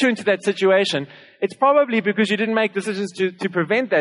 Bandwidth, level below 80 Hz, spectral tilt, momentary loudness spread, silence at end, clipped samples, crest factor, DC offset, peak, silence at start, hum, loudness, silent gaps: 11 kHz; -78 dBFS; -5 dB/octave; 9 LU; 0 s; under 0.1%; 16 dB; under 0.1%; -4 dBFS; 0 s; none; -20 LUFS; none